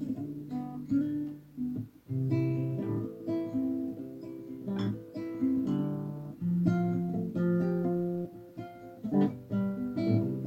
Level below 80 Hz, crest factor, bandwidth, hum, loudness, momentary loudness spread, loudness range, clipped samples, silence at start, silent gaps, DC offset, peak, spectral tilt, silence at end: -66 dBFS; 18 dB; 7 kHz; none; -33 LUFS; 12 LU; 3 LU; under 0.1%; 0 s; none; under 0.1%; -14 dBFS; -10 dB/octave; 0 s